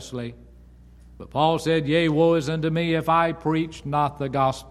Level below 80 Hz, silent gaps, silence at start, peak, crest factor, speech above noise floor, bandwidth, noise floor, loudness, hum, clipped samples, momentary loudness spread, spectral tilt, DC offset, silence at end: -48 dBFS; none; 0 s; -6 dBFS; 18 dB; 26 dB; 13.5 kHz; -48 dBFS; -22 LUFS; 60 Hz at -50 dBFS; under 0.1%; 9 LU; -6.5 dB/octave; under 0.1%; 0 s